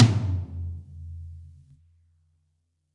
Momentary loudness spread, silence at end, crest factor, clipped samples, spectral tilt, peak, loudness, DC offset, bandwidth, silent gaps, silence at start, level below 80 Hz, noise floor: 21 LU; 1.5 s; 24 dB; under 0.1%; -7 dB/octave; -4 dBFS; -29 LUFS; under 0.1%; 9.4 kHz; none; 0 s; -52 dBFS; -73 dBFS